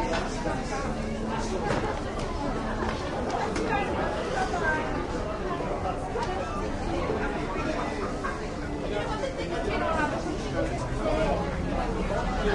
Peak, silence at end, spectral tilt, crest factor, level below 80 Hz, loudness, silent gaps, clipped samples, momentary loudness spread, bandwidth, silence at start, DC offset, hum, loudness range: -12 dBFS; 0 s; -5.5 dB/octave; 16 dB; -36 dBFS; -30 LUFS; none; under 0.1%; 4 LU; 11.5 kHz; 0 s; under 0.1%; none; 2 LU